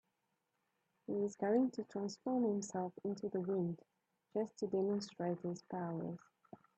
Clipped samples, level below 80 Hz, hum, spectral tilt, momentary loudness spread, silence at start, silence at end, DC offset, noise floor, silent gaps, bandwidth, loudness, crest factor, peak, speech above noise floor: under 0.1%; -84 dBFS; none; -7 dB/octave; 9 LU; 1.1 s; 0.6 s; under 0.1%; -85 dBFS; none; 8.8 kHz; -40 LUFS; 18 dB; -22 dBFS; 46 dB